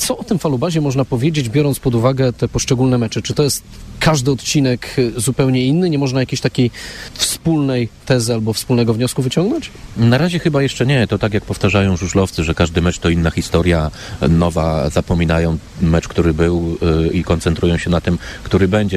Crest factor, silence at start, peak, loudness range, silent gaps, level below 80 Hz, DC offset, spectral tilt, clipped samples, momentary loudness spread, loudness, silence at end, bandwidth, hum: 14 dB; 0 s; -2 dBFS; 1 LU; none; -32 dBFS; under 0.1%; -5.5 dB/octave; under 0.1%; 4 LU; -16 LUFS; 0 s; 15.5 kHz; none